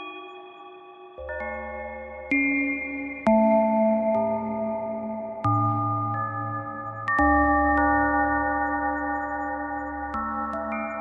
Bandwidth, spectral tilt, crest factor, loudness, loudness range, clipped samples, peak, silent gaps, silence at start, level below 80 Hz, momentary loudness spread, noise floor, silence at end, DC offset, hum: 6.6 kHz; -9 dB/octave; 16 dB; -25 LUFS; 3 LU; under 0.1%; -8 dBFS; none; 0 s; -44 dBFS; 16 LU; -45 dBFS; 0 s; under 0.1%; none